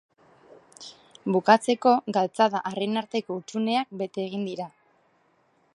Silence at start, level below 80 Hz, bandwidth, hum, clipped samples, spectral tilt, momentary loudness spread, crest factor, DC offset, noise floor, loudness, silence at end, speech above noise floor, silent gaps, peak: 0.8 s; -78 dBFS; 11.5 kHz; none; under 0.1%; -5 dB/octave; 19 LU; 24 dB; under 0.1%; -66 dBFS; -25 LUFS; 1.05 s; 41 dB; none; -4 dBFS